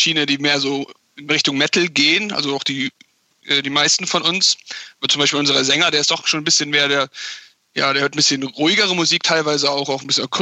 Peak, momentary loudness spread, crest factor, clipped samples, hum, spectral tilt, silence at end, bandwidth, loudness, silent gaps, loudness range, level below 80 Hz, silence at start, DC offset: -2 dBFS; 9 LU; 16 dB; under 0.1%; none; -2 dB/octave; 0 s; 8.6 kHz; -16 LUFS; none; 2 LU; -66 dBFS; 0 s; under 0.1%